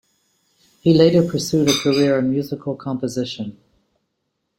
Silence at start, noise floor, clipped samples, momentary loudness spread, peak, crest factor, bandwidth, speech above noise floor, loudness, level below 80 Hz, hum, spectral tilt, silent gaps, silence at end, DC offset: 0.85 s; -74 dBFS; under 0.1%; 13 LU; -2 dBFS; 18 dB; 16.5 kHz; 56 dB; -18 LUFS; -54 dBFS; none; -5.5 dB/octave; none; 1.05 s; under 0.1%